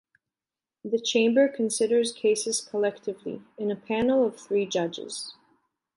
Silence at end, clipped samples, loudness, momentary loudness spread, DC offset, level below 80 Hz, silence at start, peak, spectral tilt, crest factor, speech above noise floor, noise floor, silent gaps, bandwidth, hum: 0.65 s; under 0.1%; -26 LUFS; 13 LU; under 0.1%; -68 dBFS; 0.85 s; -10 dBFS; -3.5 dB/octave; 18 dB; over 64 dB; under -90 dBFS; none; 11.5 kHz; none